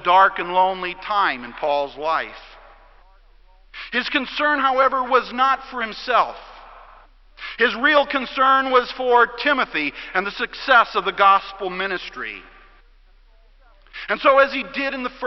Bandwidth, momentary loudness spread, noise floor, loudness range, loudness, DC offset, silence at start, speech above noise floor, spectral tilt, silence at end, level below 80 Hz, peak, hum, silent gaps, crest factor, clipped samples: 6 kHz; 13 LU; -51 dBFS; 6 LU; -19 LUFS; under 0.1%; 0 s; 32 dB; -4.5 dB/octave; 0 s; -52 dBFS; -2 dBFS; none; none; 20 dB; under 0.1%